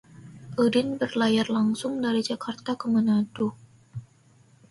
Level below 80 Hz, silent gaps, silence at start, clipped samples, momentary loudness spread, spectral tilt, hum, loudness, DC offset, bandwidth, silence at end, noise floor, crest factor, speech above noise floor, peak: -64 dBFS; none; 0.2 s; under 0.1%; 20 LU; -5.5 dB/octave; none; -26 LUFS; under 0.1%; 11.5 kHz; 0.7 s; -58 dBFS; 16 dB; 33 dB; -10 dBFS